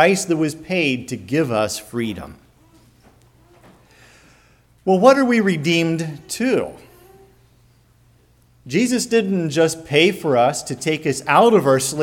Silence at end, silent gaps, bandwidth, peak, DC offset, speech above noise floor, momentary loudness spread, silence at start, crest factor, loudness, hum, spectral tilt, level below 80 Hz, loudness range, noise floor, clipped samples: 0 s; none; 17.5 kHz; 0 dBFS; under 0.1%; 37 dB; 12 LU; 0 s; 20 dB; -18 LUFS; none; -4.5 dB/octave; -56 dBFS; 9 LU; -55 dBFS; under 0.1%